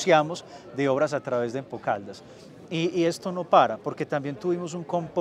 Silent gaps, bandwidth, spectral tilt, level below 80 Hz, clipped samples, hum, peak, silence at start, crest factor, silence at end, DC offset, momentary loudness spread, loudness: none; 13.5 kHz; -5.5 dB/octave; -70 dBFS; under 0.1%; none; -4 dBFS; 0 s; 22 dB; 0 s; under 0.1%; 12 LU; -26 LUFS